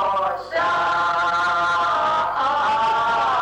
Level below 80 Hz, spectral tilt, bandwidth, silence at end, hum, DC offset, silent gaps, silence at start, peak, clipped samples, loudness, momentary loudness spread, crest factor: -56 dBFS; -3 dB/octave; 10 kHz; 0 s; none; under 0.1%; none; 0 s; -12 dBFS; under 0.1%; -20 LUFS; 2 LU; 8 dB